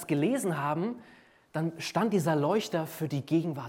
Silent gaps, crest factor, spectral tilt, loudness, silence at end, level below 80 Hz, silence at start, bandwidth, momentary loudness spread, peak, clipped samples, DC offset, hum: none; 16 dB; -6 dB/octave; -30 LUFS; 0 s; -74 dBFS; 0 s; 17 kHz; 7 LU; -14 dBFS; under 0.1%; under 0.1%; none